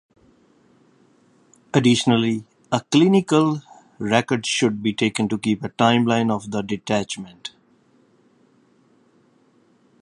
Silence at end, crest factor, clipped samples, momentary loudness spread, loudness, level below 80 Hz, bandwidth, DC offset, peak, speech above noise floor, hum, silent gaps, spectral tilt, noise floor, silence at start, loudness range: 2.55 s; 22 dB; under 0.1%; 14 LU; -20 LUFS; -60 dBFS; 11 kHz; under 0.1%; 0 dBFS; 39 dB; none; none; -5 dB/octave; -59 dBFS; 1.75 s; 10 LU